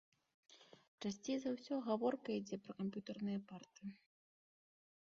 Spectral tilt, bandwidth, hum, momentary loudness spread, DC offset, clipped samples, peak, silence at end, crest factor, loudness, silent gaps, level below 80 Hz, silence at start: -6 dB/octave; 7.4 kHz; none; 15 LU; under 0.1%; under 0.1%; -26 dBFS; 1.1 s; 20 dB; -44 LUFS; 0.88-0.98 s; -84 dBFS; 0.5 s